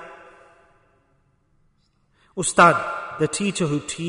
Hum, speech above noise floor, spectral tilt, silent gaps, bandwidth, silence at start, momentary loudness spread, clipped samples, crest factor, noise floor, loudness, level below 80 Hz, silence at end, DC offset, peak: none; 44 dB; -4 dB/octave; none; 11 kHz; 0 s; 17 LU; under 0.1%; 22 dB; -64 dBFS; -20 LUFS; -58 dBFS; 0 s; under 0.1%; -2 dBFS